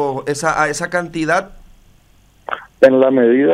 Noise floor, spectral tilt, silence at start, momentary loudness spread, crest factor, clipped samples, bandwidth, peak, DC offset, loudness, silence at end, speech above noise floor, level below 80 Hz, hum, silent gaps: -51 dBFS; -5 dB/octave; 0 s; 16 LU; 16 dB; under 0.1%; 13.5 kHz; 0 dBFS; under 0.1%; -15 LUFS; 0 s; 37 dB; -48 dBFS; none; none